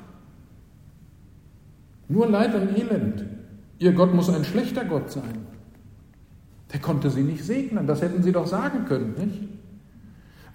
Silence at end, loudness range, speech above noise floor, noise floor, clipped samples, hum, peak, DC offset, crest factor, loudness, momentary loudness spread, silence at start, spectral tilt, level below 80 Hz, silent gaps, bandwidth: 0 s; 5 LU; 27 dB; -50 dBFS; under 0.1%; none; -4 dBFS; under 0.1%; 22 dB; -24 LUFS; 16 LU; 0 s; -8 dB/octave; -54 dBFS; none; 16 kHz